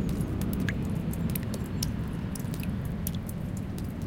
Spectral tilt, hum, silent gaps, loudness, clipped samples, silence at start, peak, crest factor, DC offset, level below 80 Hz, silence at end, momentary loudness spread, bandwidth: -6 dB/octave; none; none; -32 LUFS; under 0.1%; 0 s; -12 dBFS; 20 dB; under 0.1%; -40 dBFS; 0 s; 4 LU; 17 kHz